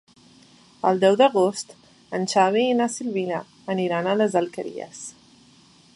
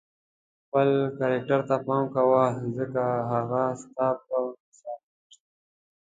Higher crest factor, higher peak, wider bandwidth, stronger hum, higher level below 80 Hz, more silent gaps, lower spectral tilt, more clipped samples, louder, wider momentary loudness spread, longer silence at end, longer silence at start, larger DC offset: about the same, 18 dB vs 18 dB; about the same, -6 dBFS vs -8 dBFS; first, 11.5 kHz vs 9.2 kHz; neither; about the same, -72 dBFS vs -68 dBFS; second, none vs 4.60-4.72 s; second, -4.5 dB/octave vs -8 dB/octave; neither; first, -22 LUFS vs -26 LUFS; about the same, 17 LU vs 15 LU; second, 0.85 s vs 1.05 s; about the same, 0.85 s vs 0.75 s; neither